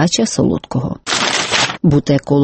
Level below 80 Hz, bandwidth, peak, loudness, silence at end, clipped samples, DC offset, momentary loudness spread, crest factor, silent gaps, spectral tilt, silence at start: -40 dBFS; 8.8 kHz; 0 dBFS; -15 LUFS; 0 s; under 0.1%; under 0.1%; 6 LU; 14 dB; none; -4.5 dB/octave; 0 s